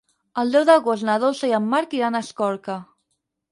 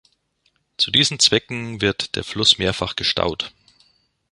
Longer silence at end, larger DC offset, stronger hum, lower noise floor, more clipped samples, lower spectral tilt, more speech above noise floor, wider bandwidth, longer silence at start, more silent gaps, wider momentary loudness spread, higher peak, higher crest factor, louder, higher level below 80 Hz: second, 0.7 s vs 0.85 s; neither; neither; first, -75 dBFS vs -67 dBFS; neither; first, -5 dB/octave vs -2.5 dB/octave; first, 55 dB vs 46 dB; about the same, 11.5 kHz vs 11.5 kHz; second, 0.35 s vs 0.8 s; neither; first, 14 LU vs 11 LU; second, -4 dBFS vs 0 dBFS; about the same, 18 dB vs 22 dB; about the same, -20 LUFS vs -18 LUFS; second, -72 dBFS vs -46 dBFS